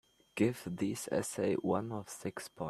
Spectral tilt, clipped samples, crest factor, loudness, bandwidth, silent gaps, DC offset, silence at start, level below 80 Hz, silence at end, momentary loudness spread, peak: -5.5 dB/octave; under 0.1%; 20 dB; -36 LUFS; 14.5 kHz; none; under 0.1%; 0.35 s; -70 dBFS; 0 s; 9 LU; -16 dBFS